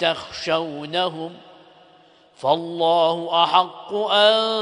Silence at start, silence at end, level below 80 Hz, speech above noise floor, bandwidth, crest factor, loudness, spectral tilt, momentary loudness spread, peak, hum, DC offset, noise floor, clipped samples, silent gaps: 0 s; 0 s; -66 dBFS; 33 dB; 10.5 kHz; 20 dB; -20 LUFS; -4 dB/octave; 11 LU; -2 dBFS; none; under 0.1%; -53 dBFS; under 0.1%; none